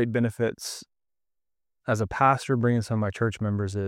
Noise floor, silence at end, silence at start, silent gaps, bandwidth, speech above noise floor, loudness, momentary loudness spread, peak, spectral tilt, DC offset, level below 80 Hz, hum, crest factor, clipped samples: -89 dBFS; 0 s; 0 s; none; 15 kHz; 64 dB; -26 LUFS; 13 LU; -6 dBFS; -6.5 dB/octave; under 0.1%; -56 dBFS; none; 20 dB; under 0.1%